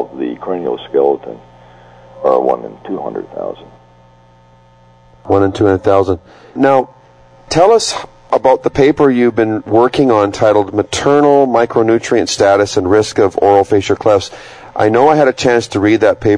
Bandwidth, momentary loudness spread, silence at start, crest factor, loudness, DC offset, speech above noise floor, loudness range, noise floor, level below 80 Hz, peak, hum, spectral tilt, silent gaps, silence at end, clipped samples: 10.5 kHz; 13 LU; 0 s; 12 dB; -12 LUFS; under 0.1%; 33 dB; 9 LU; -45 dBFS; -44 dBFS; 0 dBFS; 60 Hz at -50 dBFS; -5.5 dB/octave; none; 0 s; under 0.1%